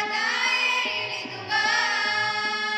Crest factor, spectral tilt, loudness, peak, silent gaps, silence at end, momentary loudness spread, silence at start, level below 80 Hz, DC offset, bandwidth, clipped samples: 14 dB; -0.5 dB/octave; -23 LUFS; -12 dBFS; none; 0 s; 6 LU; 0 s; -74 dBFS; under 0.1%; 14.5 kHz; under 0.1%